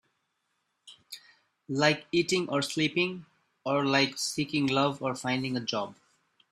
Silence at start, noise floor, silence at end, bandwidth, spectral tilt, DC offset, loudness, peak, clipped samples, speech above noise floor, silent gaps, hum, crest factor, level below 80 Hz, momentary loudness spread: 0.85 s; -78 dBFS; 0.6 s; 14 kHz; -4 dB/octave; under 0.1%; -28 LUFS; -8 dBFS; under 0.1%; 50 dB; none; none; 22 dB; -70 dBFS; 16 LU